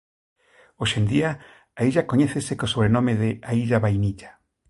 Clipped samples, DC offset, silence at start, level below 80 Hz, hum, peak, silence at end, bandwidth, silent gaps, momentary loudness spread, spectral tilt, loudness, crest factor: under 0.1%; under 0.1%; 0.8 s; -48 dBFS; none; -4 dBFS; 0.4 s; 11.5 kHz; none; 7 LU; -6 dB/octave; -23 LUFS; 18 dB